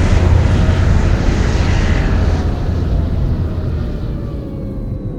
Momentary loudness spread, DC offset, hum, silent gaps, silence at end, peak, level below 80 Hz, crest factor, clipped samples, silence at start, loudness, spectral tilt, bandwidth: 11 LU; under 0.1%; none; none; 0 s; 0 dBFS; -18 dBFS; 14 dB; under 0.1%; 0 s; -16 LUFS; -7 dB/octave; 8.6 kHz